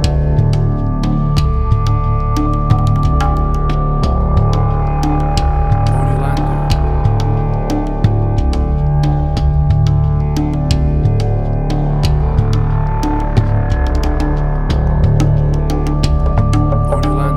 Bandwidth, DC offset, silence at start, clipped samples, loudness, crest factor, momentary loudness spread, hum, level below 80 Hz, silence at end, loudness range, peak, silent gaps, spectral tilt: 11 kHz; under 0.1%; 0 s; under 0.1%; -15 LUFS; 12 dB; 3 LU; none; -16 dBFS; 0 s; 1 LU; 0 dBFS; none; -8 dB/octave